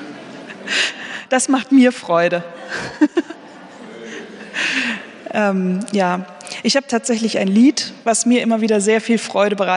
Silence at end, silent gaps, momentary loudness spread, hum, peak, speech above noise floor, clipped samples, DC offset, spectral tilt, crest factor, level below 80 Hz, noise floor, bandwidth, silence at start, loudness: 0 s; none; 19 LU; none; -2 dBFS; 22 dB; under 0.1%; under 0.1%; -4 dB/octave; 16 dB; -66 dBFS; -38 dBFS; 10.5 kHz; 0 s; -17 LUFS